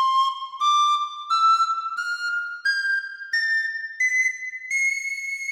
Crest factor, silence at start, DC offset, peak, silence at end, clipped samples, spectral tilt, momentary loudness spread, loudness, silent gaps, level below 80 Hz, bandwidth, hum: 12 dB; 0 s; under 0.1%; -10 dBFS; 0 s; under 0.1%; 6.5 dB/octave; 8 LU; -22 LUFS; none; -84 dBFS; 17 kHz; none